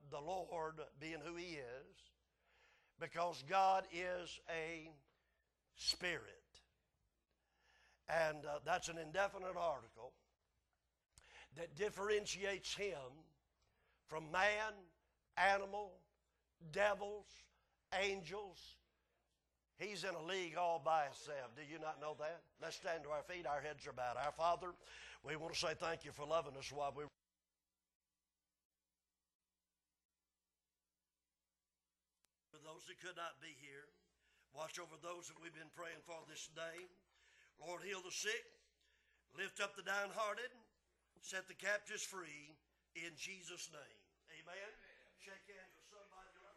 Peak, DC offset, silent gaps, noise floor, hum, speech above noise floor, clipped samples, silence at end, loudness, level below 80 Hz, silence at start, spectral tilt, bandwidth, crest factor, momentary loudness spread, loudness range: -22 dBFS; under 0.1%; 27.95-28.00 s, 28.65-28.70 s, 29.35-29.40 s, 30.05-30.09 s; under -90 dBFS; none; over 45 dB; under 0.1%; 0.05 s; -44 LUFS; -76 dBFS; 0 s; -2.5 dB/octave; 12.5 kHz; 26 dB; 20 LU; 12 LU